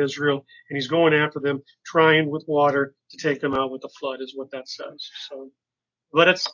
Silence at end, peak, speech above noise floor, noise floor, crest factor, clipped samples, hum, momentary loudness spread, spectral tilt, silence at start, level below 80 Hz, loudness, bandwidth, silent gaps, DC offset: 0 s; -4 dBFS; 65 dB; -88 dBFS; 20 dB; under 0.1%; none; 17 LU; -5 dB/octave; 0 s; -64 dBFS; -22 LUFS; 7.4 kHz; none; under 0.1%